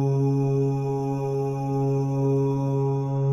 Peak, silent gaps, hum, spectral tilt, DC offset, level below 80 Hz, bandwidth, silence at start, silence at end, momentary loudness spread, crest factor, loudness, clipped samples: -14 dBFS; none; none; -10 dB/octave; under 0.1%; -56 dBFS; 6.8 kHz; 0 s; 0 s; 4 LU; 10 dB; -24 LUFS; under 0.1%